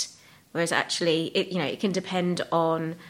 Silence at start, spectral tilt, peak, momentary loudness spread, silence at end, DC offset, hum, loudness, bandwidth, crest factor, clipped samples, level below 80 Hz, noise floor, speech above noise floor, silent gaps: 0 s; -4.5 dB/octave; -6 dBFS; 5 LU; 0 s; under 0.1%; none; -26 LUFS; 16 kHz; 20 dB; under 0.1%; -70 dBFS; -49 dBFS; 22 dB; none